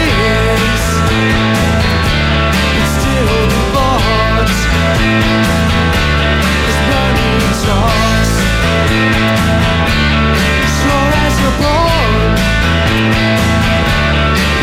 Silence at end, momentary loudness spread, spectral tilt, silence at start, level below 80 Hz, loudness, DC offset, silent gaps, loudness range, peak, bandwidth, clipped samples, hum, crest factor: 0 s; 1 LU; -5 dB/octave; 0 s; -18 dBFS; -11 LUFS; under 0.1%; none; 0 LU; -2 dBFS; 16 kHz; under 0.1%; none; 10 dB